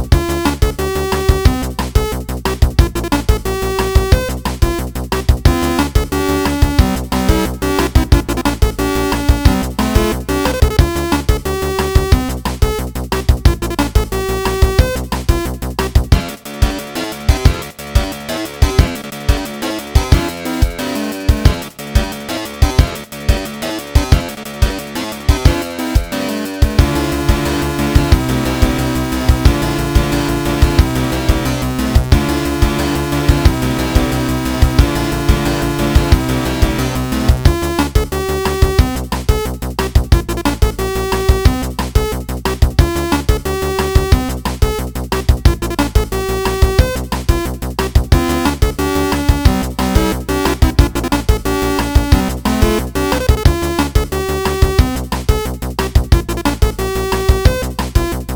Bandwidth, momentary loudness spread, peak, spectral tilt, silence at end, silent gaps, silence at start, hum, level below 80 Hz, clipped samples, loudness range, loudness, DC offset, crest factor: over 20 kHz; 6 LU; 0 dBFS; -5.5 dB/octave; 0 s; none; 0 s; none; -18 dBFS; 1%; 2 LU; -16 LUFS; 0.1%; 14 dB